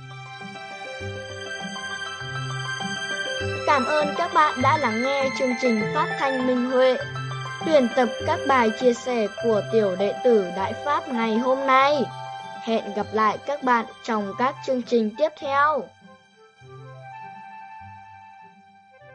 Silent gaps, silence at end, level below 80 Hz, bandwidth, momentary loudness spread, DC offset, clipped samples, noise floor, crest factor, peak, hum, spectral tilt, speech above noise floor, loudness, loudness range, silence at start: none; 0 s; -64 dBFS; 10 kHz; 16 LU; under 0.1%; under 0.1%; -53 dBFS; 18 dB; -6 dBFS; none; -5 dB/octave; 31 dB; -23 LUFS; 6 LU; 0 s